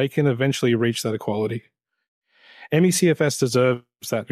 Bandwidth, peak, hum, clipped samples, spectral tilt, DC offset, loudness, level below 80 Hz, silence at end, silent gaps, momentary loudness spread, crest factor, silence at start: 15.5 kHz; -6 dBFS; none; under 0.1%; -5 dB/octave; under 0.1%; -21 LUFS; -66 dBFS; 0.05 s; 2.08-2.22 s; 10 LU; 16 dB; 0 s